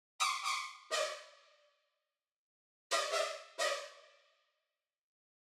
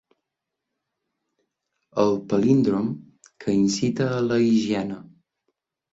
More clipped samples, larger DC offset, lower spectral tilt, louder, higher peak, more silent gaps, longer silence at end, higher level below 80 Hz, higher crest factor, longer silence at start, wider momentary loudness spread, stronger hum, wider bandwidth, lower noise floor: neither; neither; second, 3 dB/octave vs -6.5 dB/octave; second, -37 LUFS vs -23 LUFS; second, -20 dBFS vs -6 dBFS; first, 2.36-2.90 s vs none; first, 1.4 s vs 0.9 s; second, under -90 dBFS vs -60 dBFS; about the same, 22 dB vs 18 dB; second, 0.2 s vs 1.95 s; second, 8 LU vs 13 LU; neither; first, 16.5 kHz vs 8 kHz; first, under -90 dBFS vs -84 dBFS